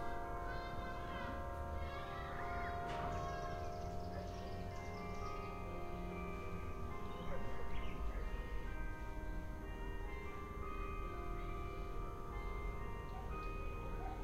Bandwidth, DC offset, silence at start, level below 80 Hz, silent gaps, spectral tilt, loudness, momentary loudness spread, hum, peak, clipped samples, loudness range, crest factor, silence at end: 15.5 kHz; under 0.1%; 0 s; -48 dBFS; none; -6.5 dB/octave; -47 LUFS; 5 LU; none; -30 dBFS; under 0.1%; 3 LU; 14 dB; 0 s